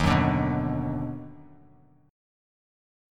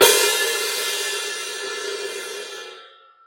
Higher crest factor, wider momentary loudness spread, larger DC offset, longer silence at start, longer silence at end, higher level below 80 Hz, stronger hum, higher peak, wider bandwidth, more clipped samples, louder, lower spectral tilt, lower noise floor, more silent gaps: about the same, 22 dB vs 22 dB; about the same, 17 LU vs 17 LU; neither; about the same, 0 s vs 0 s; first, 1 s vs 0.4 s; first, -42 dBFS vs -66 dBFS; neither; second, -8 dBFS vs 0 dBFS; second, 11.5 kHz vs 16.5 kHz; neither; second, -27 LUFS vs -22 LUFS; first, -7 dB/octave vs 1 dB/octave; first, -58 dBFS vs -47 dBFS; neither